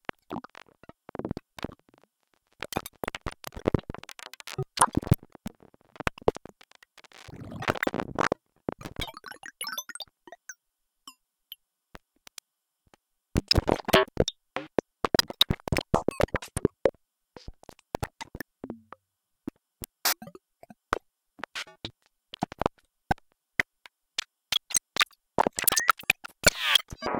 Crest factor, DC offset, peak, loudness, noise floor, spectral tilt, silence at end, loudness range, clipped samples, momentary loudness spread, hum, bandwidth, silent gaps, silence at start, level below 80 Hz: 26 dB; under 0.1%; -6 dBFS; -28 LUFS; -80 dBFS; -3 dB/octave; 0 s; 13 LU; under 0.1%; 22 LU; none; 18 kHz; none; 0.3 s; -46 dBFS